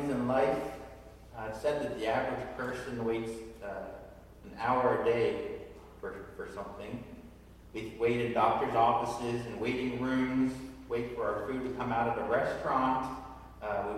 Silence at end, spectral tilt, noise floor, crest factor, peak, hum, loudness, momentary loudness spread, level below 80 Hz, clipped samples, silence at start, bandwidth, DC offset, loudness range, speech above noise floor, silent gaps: 0 s; -6.5 dB/octave; -53 dBFS; 20 dB; -14 dBFS; none; -33 LUFS; 17 LU; -56 dBFS; under 0.1%; 0 s; 15.5 kHz; under 0.1%; 5 LU; 21 dB; none